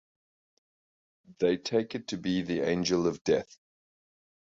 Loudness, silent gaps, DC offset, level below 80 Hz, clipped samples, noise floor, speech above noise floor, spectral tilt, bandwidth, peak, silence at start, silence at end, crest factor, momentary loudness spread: -30 LUFS; 3.21-3.25 s; under 0.1%; -62 dBFS; under 0.1%; under -90 dBFS; over 61 dB; -5 dB/octave; 7.8 kHz; -14 dBFS; 1.3 s; 1.1 s; 18 dB; 6 LU